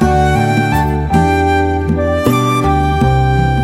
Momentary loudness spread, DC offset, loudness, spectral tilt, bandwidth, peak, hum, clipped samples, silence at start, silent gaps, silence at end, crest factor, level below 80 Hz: 3 LU; under 0.1%; -13 LUFS; -7 dB/octave; 16.5 kHz; 0 dBFS; none; under 0.1%; 0 s; none; 0 s; 12 dB; -22 dBFS